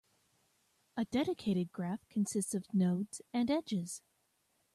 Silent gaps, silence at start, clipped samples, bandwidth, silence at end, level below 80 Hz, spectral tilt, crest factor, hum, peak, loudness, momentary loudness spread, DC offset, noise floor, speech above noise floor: none; 0.95 s; under 0.1%; 13.5 kHz; 0.75 s; -72 dBFS; -6 dB/octave; 14 dB; none; -22 dBFS; -36 LUFS; 8 LU; under 0.1%; -77 dBFS; 42 dB